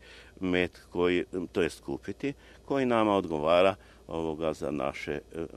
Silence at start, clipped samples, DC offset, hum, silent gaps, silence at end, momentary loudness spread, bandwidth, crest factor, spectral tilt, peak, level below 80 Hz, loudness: 0.05 s; under 0.1%; under 0.1%; none; none; 0 s; 12 LU; 13 kHz; 20 dB; -6 dB/octave; -10 dBFS; -56 dBFS; -30 LUFS